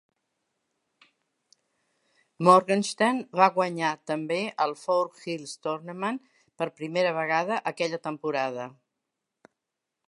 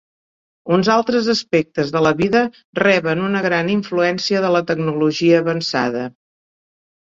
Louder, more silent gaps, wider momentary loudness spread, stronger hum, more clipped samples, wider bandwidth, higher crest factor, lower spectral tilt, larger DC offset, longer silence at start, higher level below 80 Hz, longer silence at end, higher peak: second, -26 LUFS vs -17 LUFS; second, none vs 2.65-2.73 s; first, 13 LU vs 6 LU; neither; neither; first, 11.5 kHz vs 7.8 kHz; first, 24 dB vs 16 dB; about the same, -5 dB/octave vs -5.5 dB/octave; neither; first, 2.4 s vs 0.65 s; second, -82 dBFS vs -56 dBFS; first, 1.35 s vs 0.9 s; about the same, -4 dBFS vs -2 dBFS